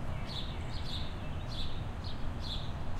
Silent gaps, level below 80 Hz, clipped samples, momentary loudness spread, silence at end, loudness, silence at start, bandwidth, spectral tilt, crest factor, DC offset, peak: none; -40 dBFS; under 0.1%; 2 LU; 0 s; -40 LUFS; 0 s; 9.8 kHz; -5.5 dB/octave; 12 dB; under 0.1%; -24 dBFS